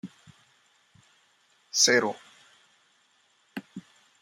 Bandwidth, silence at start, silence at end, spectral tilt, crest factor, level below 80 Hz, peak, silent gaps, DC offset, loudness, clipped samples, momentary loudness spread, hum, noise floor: 16 kHz; 0.05 s; 0.4 s; -1 dB/octave; 26 dB; -82 dBFS; -8 dBFS; none; under 0.1%; -23 LUFS; under 0.1%; 26 LU; none; -67 dBFS